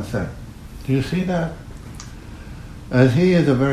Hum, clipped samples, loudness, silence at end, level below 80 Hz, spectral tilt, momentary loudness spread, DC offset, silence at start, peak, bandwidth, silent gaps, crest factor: none; under 0.1%; -19 LUFS; 0 s; -40 dBFS; -7.5 dB/octave; 22 LU; under 0.1%; 0 s; -2 dBFS; 13.5 kHz; none; 18 dB